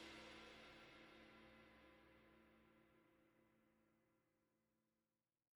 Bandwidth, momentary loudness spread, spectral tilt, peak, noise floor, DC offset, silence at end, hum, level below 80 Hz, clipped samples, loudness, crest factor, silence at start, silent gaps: 18 kHz; 10 LU; -3.5 dB/octave; -48 dBFS; under -90 dBFS; under 0.1%; 0.55 s; none; -84 dBFS; under 0.1%; -63 LUFS; 20 dB; 0 s; none